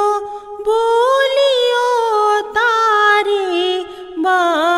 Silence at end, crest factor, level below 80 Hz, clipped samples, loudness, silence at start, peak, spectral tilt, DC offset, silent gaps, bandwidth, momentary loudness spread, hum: 0 s; 12 dB; -56 dBFS; under 0.1%; -14 LUFS; 0 s; -2 dBFS; -1 dB/octave; under 0.1%; none; 14.5 kHz; 10 LU; none